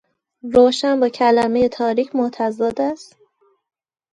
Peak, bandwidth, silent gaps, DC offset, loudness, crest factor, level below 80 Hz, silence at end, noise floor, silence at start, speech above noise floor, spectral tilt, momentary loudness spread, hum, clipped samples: -2 dBFS; 10 kHz; none; under 0.1%; -18 LUFS; 18 dB; -56 dBFS; 1.1 s; -59 dBFS; 0.45 s; 42 dB; -5 dB/octave; 9 LU; none; under 0.1%